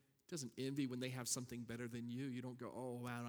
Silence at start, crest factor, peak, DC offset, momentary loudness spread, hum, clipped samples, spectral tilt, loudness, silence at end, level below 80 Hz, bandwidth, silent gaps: 0.3 s; 18 dB; -28 dBFS; under 0.1%; 7 LU; none; under 0.1%; -4.5 dB/octave; -46 LUFS; 0 s; -80 dBFS; over 20 kHz; none